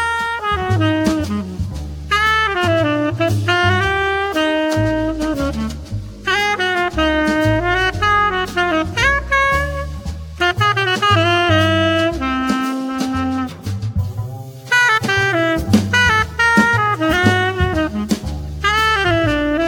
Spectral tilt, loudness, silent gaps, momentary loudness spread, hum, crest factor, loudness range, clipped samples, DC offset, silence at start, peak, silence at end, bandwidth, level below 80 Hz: -5 dB/octave; -16 LUFS; none; 11 LU; none; 16 dB; 3 LU; under 0.1%; under 0.1%; 0 s; 0 dBFS; 0 s; 18 kHz; -32 dBFS